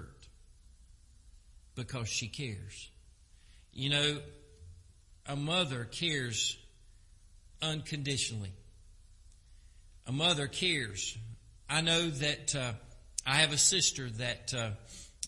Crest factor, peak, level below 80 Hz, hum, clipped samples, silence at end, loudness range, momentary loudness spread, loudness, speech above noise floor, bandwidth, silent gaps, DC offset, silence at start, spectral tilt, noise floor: 26 dB; -10 dBFS; -58 dBFS; none; under 0.1%; 0 s; 10 LU; 21 LU; -32 LUFS; 26 dB; 11.5 kHz; none; under 0.1%; 0 s; -2.5 dB/octave; -59 dBFS